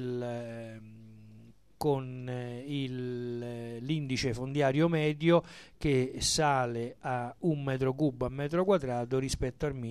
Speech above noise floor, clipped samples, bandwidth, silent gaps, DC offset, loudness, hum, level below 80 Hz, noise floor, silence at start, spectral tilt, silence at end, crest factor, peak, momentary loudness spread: 26 dB; under 0.1%; 14 kHz; none; under 0.1%; -31 LUFS; none; -52 dBFS; -56 dBFS; 0 s; -5.5 dB/octave; 0 s; 18 dB; -12 dBFS; 12 LU